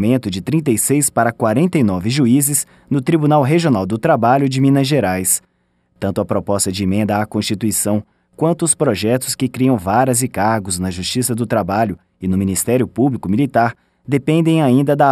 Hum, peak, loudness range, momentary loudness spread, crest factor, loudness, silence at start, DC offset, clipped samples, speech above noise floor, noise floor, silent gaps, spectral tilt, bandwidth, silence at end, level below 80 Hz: none; -2 dBFS; 3 LU; 7 LU; 14 dB; -16 LUFS; 0 s; under 0.1%; under 0.1%; 46 dB; -61 dBFS; none; -5 dB/octave; 15.5 kHz; 0 s; -50 dBFS